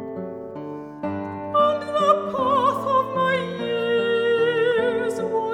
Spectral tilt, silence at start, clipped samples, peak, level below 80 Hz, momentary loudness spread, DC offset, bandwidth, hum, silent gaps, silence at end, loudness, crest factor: -5.5 dB/octave; 0 s; under 0.1%; -6 dBFS; -62 dBFS; 13 LU; under 0.1%; 12 kHz; none; none; 0 s; -22 LUFS; 16 dB